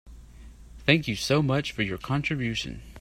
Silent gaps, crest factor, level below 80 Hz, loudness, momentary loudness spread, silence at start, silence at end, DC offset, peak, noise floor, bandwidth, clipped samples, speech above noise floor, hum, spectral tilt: none; 22 dB; -48 dBFS; -26 LUFS; 7 LU; 0.05 s; 0 s; under 0.1%; -4 dBFS; -47 dBFS; 15.5 kHz; under 0.1%; 20 dB; none; -5.5 dB/octave